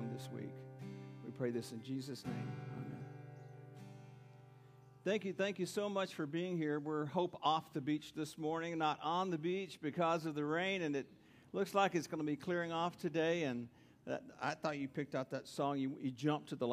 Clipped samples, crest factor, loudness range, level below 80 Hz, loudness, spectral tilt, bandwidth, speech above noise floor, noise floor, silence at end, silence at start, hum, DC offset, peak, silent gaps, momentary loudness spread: under 0.1%; 20 dB; 8 LU; -82 dBFS; -40 LUFS; -6 dB/octave; 15.5 kHz; 22 dB; -61 dBFS; 0 s; 0 s; none; under 0.1%; -20 dBFS; none; 15 LU